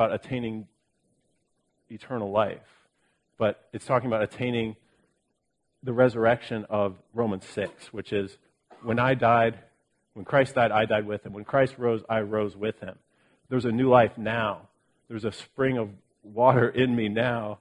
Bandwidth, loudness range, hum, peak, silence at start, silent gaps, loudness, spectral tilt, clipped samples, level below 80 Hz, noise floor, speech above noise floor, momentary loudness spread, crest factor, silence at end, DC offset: 11 kHz; 6 LU; none; -6 dBFS; 0 s; none; -26 LUFS; -7 dB/octave; under 0.1%; -62 dBFS; -76 dBFS; 51 dB; 16 LU; 22 dB; 0.05 s; under 0.1%